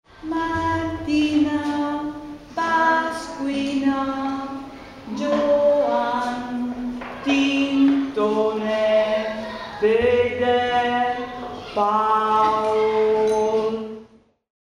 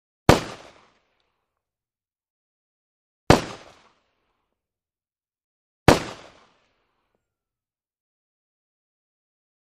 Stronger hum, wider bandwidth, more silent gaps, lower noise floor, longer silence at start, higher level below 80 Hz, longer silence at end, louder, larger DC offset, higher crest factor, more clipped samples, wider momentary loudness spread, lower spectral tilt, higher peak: neither; second, 11 kHz vs 13 kHz; second, none vs 2.30-3.27 s, 5.44-5.86 s; second, -50 dBFS vs under -90 dBFS; about the same, 0.2 s vs 0.3 s; second, -50 dBFS vs -44 dBFS; second, 0.6 s vs 3.65 s; about the same, -21 LUFS vs -20 LUFS; neither; second, 14 dB vs 28 dB; neither; second, 12 LU vs 21 LU; about the same, -5.5 dB/octave vs -5 dB/octave; second, -8 dBFS vs 0 dBFS